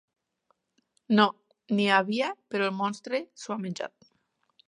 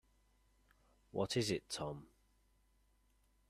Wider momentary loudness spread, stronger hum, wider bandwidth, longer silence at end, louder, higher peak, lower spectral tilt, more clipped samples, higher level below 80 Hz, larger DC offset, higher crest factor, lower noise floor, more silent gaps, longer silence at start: about the same, 12 LU vs 11 LU; neither; second, 10.5 kHz vs 14.5 kHz; second, 0.8 s vs 1.45 s; first, -28 LUFS vs -41 LUFS; first, -6 dBFS vs -24 dBFS; about the same, -5 dB/octave vs -4.5 dB/octave; neither; second, -80 dBFS vs -70 dBFS; neither; about the same, 22 dB vs 22 dB; about the same, -74 dBFS vs -75 dBFS; neither; about the same, 1.1 s vs 1.15 s